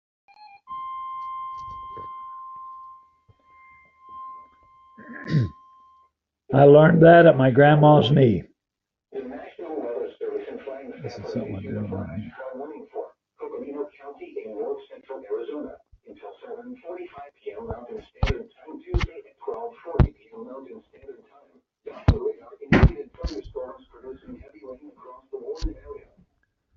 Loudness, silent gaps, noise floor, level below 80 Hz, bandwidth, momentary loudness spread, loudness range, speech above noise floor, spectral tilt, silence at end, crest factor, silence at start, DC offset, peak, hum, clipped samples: -21 LUFS; none; -86 dBFS; -38 dBFS; 6.6 kHz; 27 LU; 21 LU; 70 dB; -6.5 dB/octave; 0.85 s; 22 dB; 0.7 s; under 0.1%; -2 dBFS; none; under 0.1%